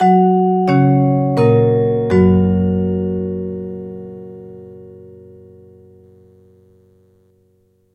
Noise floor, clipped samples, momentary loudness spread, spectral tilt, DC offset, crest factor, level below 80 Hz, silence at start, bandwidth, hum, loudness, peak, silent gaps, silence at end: -58 dBFS; under 0.1%; 22 LU; -10 dB/octave; under 0.1%; 16 dB; -48 dBFS; 0 s; 5.6 kHz; none; -15 LUFS; 0 dBFS; none; 2.85 s